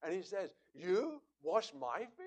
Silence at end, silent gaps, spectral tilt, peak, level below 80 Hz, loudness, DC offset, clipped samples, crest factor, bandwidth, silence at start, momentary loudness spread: 0 s; none; -4.5 dB/octave; -20 dBFS; -88 dBFS; -40 LUFS; under 0.1%; under 0.1%; 20 dB; 9 kHz; 0 s; 10 LU